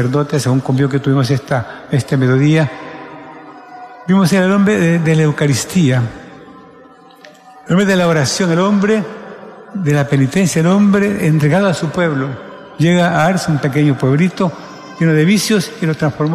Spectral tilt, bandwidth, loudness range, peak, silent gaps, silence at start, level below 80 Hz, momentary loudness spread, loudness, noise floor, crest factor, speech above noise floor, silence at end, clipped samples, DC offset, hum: -6 dB/octave; 14 kHz; 2 LU; -2 dBFS; none; 0 s; -50 dBFS; 18 LU; -14 LUFS; -41 dBFS; 12 dB; 28 dB; 0 s; under 0.1%; under 0.1%; none